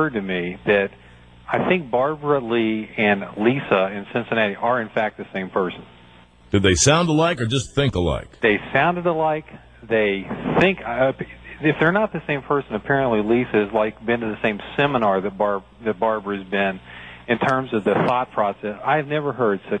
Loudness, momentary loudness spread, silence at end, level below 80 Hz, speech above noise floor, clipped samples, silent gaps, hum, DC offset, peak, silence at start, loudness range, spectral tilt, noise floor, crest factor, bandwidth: -21 LUFS; 7 LU; 0 s; -46 dBFS; 28 dB; under 0.1%; none; none; under 0.1%; -4 dBFS; 0 s; 3 LU; -5 dB/octave; -49 dBFS; 18 dB; 10 kHz